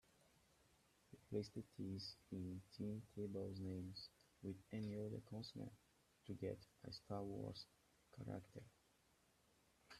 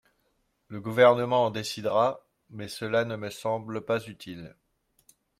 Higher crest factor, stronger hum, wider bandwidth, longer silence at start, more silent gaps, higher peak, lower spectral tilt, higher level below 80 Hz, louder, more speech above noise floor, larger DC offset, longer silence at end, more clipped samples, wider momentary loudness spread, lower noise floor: about the same, 20 dB vs 22 dB; neither; about the same, 14 kHz vs 15 kHz; second, 0.2 s vs 0.7 s; neither; second, -32 dBFS vs -6 dBFS; first, -7 dB/octave vs -5 dB/octave; second, -78 dBFS vs -68 dBFS; second, -52 LUFS vs -26 LUFS; second, 27 dB vs 46 dB; neither; second, 0 s vs 0.9 s; neither; second, 12 LU vs 22 LU; first, -78 dBFS vs -73 dBFS